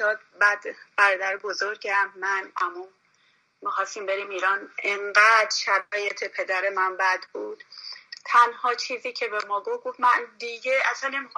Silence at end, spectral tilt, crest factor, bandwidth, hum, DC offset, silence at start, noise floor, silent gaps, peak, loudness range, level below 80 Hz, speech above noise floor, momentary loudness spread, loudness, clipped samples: 0.1 s; 0.5 dB/octave; 20 dB; 10.5 kHz; none; under 0.1%; 0 s; -65 dBFS; none; -6 dBFS; 5 LU; -88 dBFS; 40 dB; 14 LU; -24 LUFS; under 0.1%